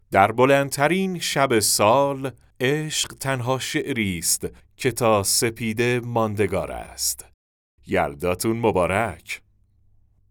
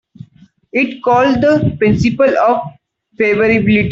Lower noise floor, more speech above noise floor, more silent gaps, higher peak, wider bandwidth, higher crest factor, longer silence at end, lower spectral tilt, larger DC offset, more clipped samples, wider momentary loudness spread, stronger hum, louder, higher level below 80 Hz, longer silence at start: first, -59 dBFS vs -46 dBFS; about the same, 37 dB vs 34 dB; first, 7.34-7.78 s vs none; about the same, -2 dBFS vs -2 dBFS; first, over 20 kHz vs 7.6 kHz; first, 22 dB vs 12 dB; first, 0.95 s vs 0 s; second, -3.5 dB/octave vs -7.5 dB/octave; neither; neither; first, 10 LU vs 6 LU; neither; second, -22 LUFS vs -13 LUFS; second, -52 dBFS vs -40 dBFS; second, 0.1 s vs 0.75 s